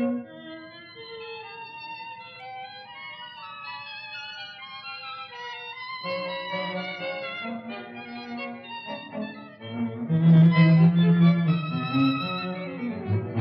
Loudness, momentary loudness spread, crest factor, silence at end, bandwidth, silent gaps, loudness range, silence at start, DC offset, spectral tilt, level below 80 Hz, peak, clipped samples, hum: -25 LUFS; 21 LU; 18 dB; 0 s; 5.6 kHz; none; 17 LU; 0 s; under 0.1%; -9.5 dB/octave; -74 dBFS; -8 dBFS; under 0.1%; none